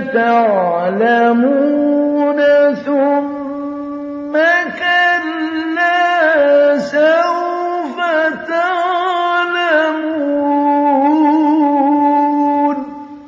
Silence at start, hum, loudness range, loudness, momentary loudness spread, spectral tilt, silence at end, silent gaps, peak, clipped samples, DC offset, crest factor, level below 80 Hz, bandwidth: 0 s; none; 2 LU; -14 LUFS; 8 LU; -5.5 dB/octave; 0 s; none; 0 dBFS; under 0.1%; under 0.1%; 12 dB; -62 dBFS; 7.4 kHz